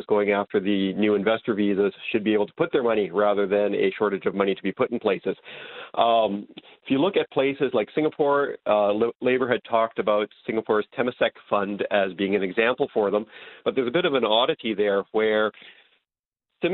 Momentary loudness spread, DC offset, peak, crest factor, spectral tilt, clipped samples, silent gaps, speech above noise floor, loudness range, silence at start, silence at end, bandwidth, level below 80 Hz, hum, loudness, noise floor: 6 LU; under 0.1%; -4 dBFS; 18 dB; -10 dB/octave; under 0.1%; 9.16-9.20 s, 16.26-16.32 s; 63 dB; 2 LU; 0 s; 0 s; 4.3 kHz; -66 dBFS; none; -24 LUFS; -87 dBFS